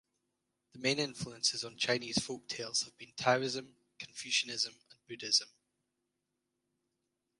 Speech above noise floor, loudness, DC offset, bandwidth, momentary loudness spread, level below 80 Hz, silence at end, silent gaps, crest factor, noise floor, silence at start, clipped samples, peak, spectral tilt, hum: 50 dB; -34 LUFS; under 0.1%; 11.5 kHz; 14 LU; -74 dBFS; 1.95 s; none; 26 dB; -86 dBFS; 0.75 s; under 0.1%; -14 dBFS; -2 dB/octave; 50 Hz at -75 dBFS